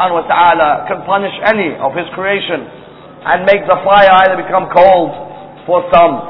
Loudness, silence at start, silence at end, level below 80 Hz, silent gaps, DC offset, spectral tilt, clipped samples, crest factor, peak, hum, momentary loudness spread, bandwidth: -11 LUFS; 0 s; 0 s; -44 dBFS; none; under 0.1%; -7 dB/octave; 0.5%; 12 dB; 0 dBFS; none; 13 LU; 5.4 kHz